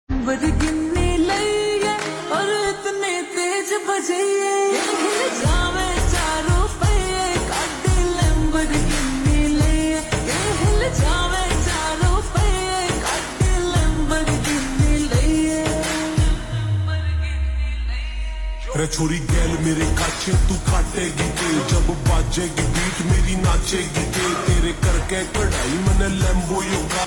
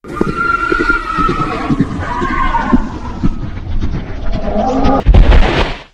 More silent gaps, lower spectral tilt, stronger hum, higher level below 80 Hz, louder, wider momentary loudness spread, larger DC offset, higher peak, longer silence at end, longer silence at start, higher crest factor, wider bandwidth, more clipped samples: neither; second, -4.5 dB/octave vs -7 dB/octave; neither; second, -24 dBFS vs -16 dBFS; second, -20 LUFS vs -15 LUFS; second, 4 LU vs 11 LU; neither; second, -6 dBFS vs 0 dBFS; about the same, 0 s vs 0.1 s; about the same, 0.1 s vs 0.05 s; about the same, 12 dB vs 12 dB; first, 19 kHz vs 8.8 kHz; second, under 0.1% vs 1%